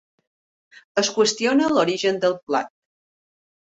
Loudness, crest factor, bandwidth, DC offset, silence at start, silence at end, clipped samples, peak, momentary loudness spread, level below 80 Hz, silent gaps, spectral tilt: -21 LUFS; 18 dB; 8.4 kHz; under 0.1%; 0.95 s; 1.05 s; under 0.1%; -6 dBFS; 7 LU; -66 dBFS; 2.43-2.47 s; -3 dB/octave